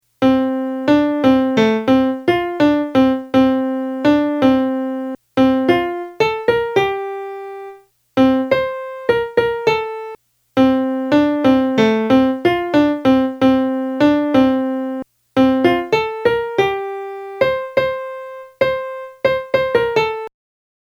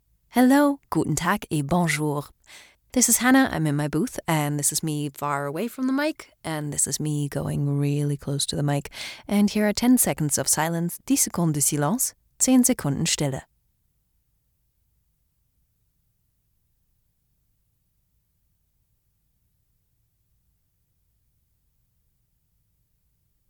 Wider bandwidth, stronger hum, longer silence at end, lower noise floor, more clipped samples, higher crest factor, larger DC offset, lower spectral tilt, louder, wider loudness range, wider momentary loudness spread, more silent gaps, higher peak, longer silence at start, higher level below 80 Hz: second, 12 kHz vs over 20 kHz; neither; second, 0.6 s vs 10.1 s; second, -41 dBFS vs -70 dBFS; neither; second, 16 dB vs 22 dB; neither; first, -6.5 dB/octave vs -4 dB/octave; first, -16 LUFS vs -23 LUFS; about the same, 4 LU vs 4 LU; about the same, 12 LU vs 10 LU; neither; first, 0 dBFS vs -4 dBFS; second, 0.2 s vs 0.35 s; first, -48 dBFS vs -56 dBFS